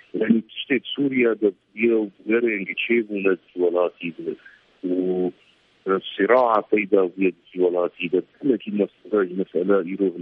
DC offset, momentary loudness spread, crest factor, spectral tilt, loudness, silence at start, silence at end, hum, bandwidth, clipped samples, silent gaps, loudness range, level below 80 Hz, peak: under 0.1%; 6 LU; 20 dB; -9 dB/octave; -22 LUFS; 0.15 s; 0 s; none; 4.3 kHz; under 0.1%; none; 3 LU; -72 dBFS; -2 dBFS